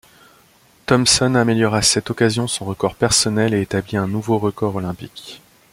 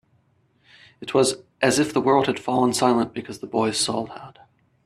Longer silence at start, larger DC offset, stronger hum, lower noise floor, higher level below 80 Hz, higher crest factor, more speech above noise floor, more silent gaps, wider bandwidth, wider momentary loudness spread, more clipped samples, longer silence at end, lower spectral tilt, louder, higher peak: about the same, 0.9 s vs 1 s; neither; neither; second, -53 dBFS vs -63 dBFS; first, -46 dBFS vs -62 dBFS; about the same, 18 dB vs 20 dB; second, 35 dB vs 42 dB; neither; first, 16.5 kHz vs 13.5 kHz; first, 15 LU vs 12 LU; neither; second, 0.35 s vs 0.55 s; about the same, -4 dB/octave vs -4 dB/octave; first, -17 LUFS vs -22 LUFS; about the same, -2 dBFS vs -4 dBFS